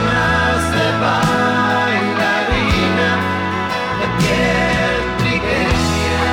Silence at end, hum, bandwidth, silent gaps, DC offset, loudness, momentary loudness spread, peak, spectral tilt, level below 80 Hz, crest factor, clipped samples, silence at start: 0 s; none; 18.5 kHz; none; under 0.1%; -16 LUFS; 4 LU; -6 dBFS; -5 dB/octave; -30 dBFS; 10 dB; under 0.1%; 0 s